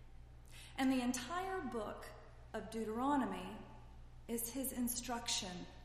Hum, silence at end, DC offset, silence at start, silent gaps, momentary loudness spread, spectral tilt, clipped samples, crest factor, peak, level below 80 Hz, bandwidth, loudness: none; 0 s; under 0.1%; 0 s; none; 21 LU; -3.5 dB/octave; under 0.1%; 16 dB; -26 dBFS; -58 dBFS; 15 kHz; -41 LUFS